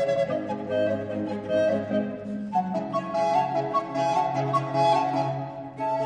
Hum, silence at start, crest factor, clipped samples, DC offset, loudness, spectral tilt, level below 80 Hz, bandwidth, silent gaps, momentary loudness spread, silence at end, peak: none; 0 s; 14 dB; under 0.1%; under 0.1%; -26 LUFS; -6.5 dB/octave; -62 dBFS; 10 kHz; none; 8 LU; 0 s; -12 dBFS